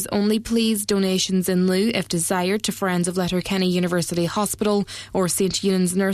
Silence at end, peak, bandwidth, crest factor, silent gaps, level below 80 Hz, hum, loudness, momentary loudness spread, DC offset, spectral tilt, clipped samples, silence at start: 0 s; -6 dBFS; 14 kHz; 14 dB; none; -50 dBFS; none; -21 LUFS; 3 LU; under 0.1%; -4.5 dB/octave; under 0.1%; 0 s